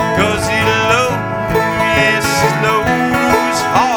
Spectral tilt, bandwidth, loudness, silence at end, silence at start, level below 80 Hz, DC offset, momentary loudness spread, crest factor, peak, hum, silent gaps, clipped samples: -4.5 dB/octave; over 20 kHz; -13 LUFS; 0 s; 0 s; -36 dBFS; under 0.1%; 4 LU; 14 dB; 0 dBFS; none; none; under 0.1%